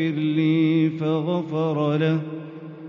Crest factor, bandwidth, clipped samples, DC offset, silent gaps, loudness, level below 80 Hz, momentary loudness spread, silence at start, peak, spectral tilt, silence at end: 12 dB; 6 kHz; under 0.1%; under 0.1%; none; -22 LUFS; -72 dBFS; 12 LU; 0 s; -10 dBFS; -7 dB/octave; 0 s